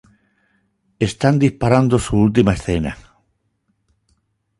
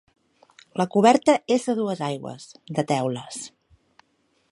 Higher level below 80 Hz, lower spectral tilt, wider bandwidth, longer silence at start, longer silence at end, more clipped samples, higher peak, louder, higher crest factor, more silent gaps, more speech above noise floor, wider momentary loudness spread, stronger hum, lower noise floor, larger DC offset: first, -38 dBFS vs -70 dBFS; first, -7 dB/octave vs -5.5 dB/octave; about the same, 11.5 kHz vs 11.5 kHz; first, 1 s vs 0.75 s; first, 1.6 s vs 1.05 s; neither; first, 0 dBFS vs -4 dBFS; first, -17 LUFS vs -23 LUFS; about the same, 18 dB vs 22 dB; neither; first, 52 dB vs 45 dB; second, 9 LU vs 19 LU; neither; about the same, -67 dBFS vs -68 dBFS; neither